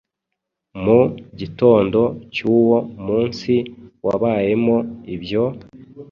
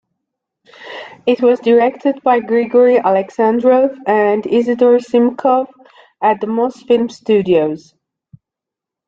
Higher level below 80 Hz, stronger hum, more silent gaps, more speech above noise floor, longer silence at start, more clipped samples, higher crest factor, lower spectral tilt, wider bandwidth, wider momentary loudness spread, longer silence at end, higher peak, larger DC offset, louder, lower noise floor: first, -50 dBFS vs -62 dBFS; neither; neither; second, 62 dB vs 71 dB; about the same, 0.75 s vs 0.8 s; neither; about the same, 16 dB vs 12 dB; about the same, -8 dB/octave vs -7 dB/octave; about the same, 6.8 kHz vs 7.4 kHz; first, 15 LU vs 7 LU; second, 0.1 s vs 1.3 s; about the same, -2 dBFS vs -2 dBFS; neither; second, -18 LUFS vs -14 LUFS; second, -80 dBFS vs -84 dBFS